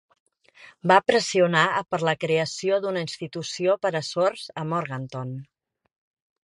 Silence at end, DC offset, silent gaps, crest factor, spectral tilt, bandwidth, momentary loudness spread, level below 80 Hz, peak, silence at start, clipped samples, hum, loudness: 1 s; under 0.1%; none; 24 dB; -4.5 dB/octave; 11.5 kHz; 13 LU; -68 dBFS; -2 dBFS; 0.6 s; under 0.1%; none; -24 LUFS